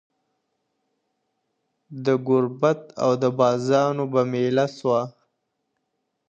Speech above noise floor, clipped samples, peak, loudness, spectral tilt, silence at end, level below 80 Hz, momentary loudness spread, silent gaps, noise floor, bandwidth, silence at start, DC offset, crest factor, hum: 55 dB; under 0.1%; -4 dBFS; -22 LUFS; -7 dB/octave; 1.2 s; -72 dBFS; 5 LU; none; -77 dBFS; 8.2 kHz; 1.9 s; under 0.1%; 20 dB; none